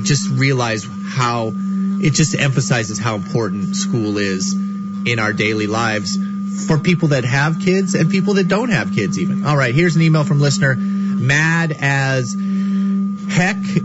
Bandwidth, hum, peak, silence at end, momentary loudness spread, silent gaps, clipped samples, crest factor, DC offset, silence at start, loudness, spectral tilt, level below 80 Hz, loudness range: 8 kHz; none; -2 dBFS; 0 s; 6 LU; none; under 0.1%; 14 dB; under 0.1%; 0 s; -17 LUFS; -5.5 dB/octave; -50 dBFS; 3 LU